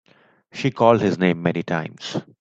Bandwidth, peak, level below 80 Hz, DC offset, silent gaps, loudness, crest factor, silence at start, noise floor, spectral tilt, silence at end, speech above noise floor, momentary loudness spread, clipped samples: 7.8 kHz; -2 dBFS; -60 dBFS; under 0.1%; none; -21 LUFS; 20 dB; 0.55 s; -56 dBFS; -6.5 dB/octave; 0.2 s; 36 dB; 13 LU; under 0.1%